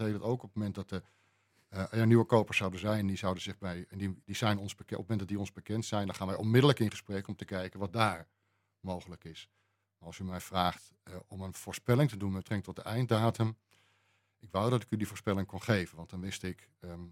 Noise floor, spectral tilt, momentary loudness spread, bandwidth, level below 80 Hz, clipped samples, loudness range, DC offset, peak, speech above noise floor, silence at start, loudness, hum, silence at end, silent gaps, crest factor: -74 dBFS; -6 dB/octave; 16 LU; 16 kHz; -68 dBFS; under 0.1%; 7 LU; under 0.1%; -10 dBFS; 40 dB; 0 s; -33 LUFS; none; 0 s; none; 24 dB